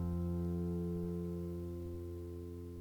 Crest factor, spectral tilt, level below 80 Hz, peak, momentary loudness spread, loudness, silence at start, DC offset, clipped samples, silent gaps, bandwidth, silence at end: 12 dB; -10 dB/octave; -52 dBFS; -28 dBFS; 8 LU; -41 LUFS; 0 s; under 0.1%; under 0.1%; none; 19.5 kHz; 0 s